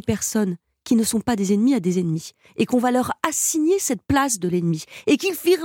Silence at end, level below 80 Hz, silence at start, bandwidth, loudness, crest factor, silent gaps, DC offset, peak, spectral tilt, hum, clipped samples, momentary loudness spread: 0 s; -52 dBFS; 0.05 s; 17.5 kHz; -21 LUFS; 20 dB; none; under 0.1%; -2 dBFS; -4.5 dB/octave; none; under 0.1%; 7 LU